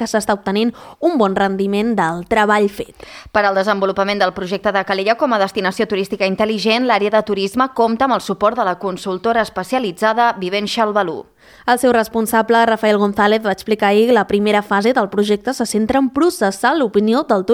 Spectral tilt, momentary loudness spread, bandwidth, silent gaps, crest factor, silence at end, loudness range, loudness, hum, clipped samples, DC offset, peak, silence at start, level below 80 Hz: -5 dB/octave; 6 LU; 16.5 kHz; none; 14 dB; 0 s; 3 LU; -16 LUFS; none; under 0.1%; under 0.1%; -2 dBFS; 0 s; -50 dBFS